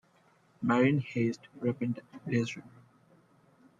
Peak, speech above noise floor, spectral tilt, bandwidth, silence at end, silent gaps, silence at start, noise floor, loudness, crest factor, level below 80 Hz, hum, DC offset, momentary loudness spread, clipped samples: -14 dBFS; 35 dB; -7.5 dB/octave; 7.8 kHz; 1.1 s; none; 0.6 s; -66 dBFS; -31 LUFS; 18 dB; -72 dBFS; none; under 0.1%; 11 LU; under 0.1%